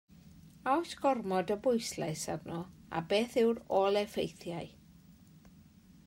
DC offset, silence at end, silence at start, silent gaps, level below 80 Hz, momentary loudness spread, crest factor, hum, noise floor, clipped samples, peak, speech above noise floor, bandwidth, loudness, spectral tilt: under 0.1%; 0.45 s; 0.25 s; none; -66 dBFS; 13 LU; 18 dB; none; -59 dBFS; under 0.1%; -16 dBFS; 26 dB; 16 kHz; -33 LUFS; -5 dB/octave